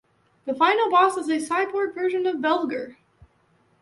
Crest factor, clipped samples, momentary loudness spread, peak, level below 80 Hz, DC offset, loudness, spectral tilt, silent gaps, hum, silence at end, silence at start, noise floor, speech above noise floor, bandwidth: 16 dB; under 0.1%; 14 LU; -8 dBFS; -68 dBFS; under 0.1%; -23 LUFS; -3.5 dB/octave; none; none; 0.9 s; 0.45 s; -63 dBFS; 41 dB; 11.5 kHz